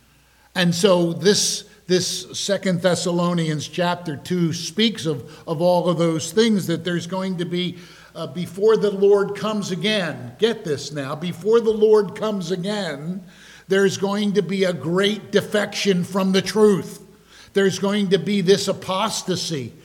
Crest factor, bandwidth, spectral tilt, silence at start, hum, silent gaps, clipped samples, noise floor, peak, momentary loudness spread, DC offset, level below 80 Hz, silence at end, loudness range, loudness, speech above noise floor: 18 dB; 16.5 kHz; -4.5 dB/octave; 0.55 s; none; none; under 0.1%; -55 dBFS; -4 dBFS; 11 LU; under 0.1%; -60 dBFS; 0.15 s; 2 LU; -21 LUFS; 35 dB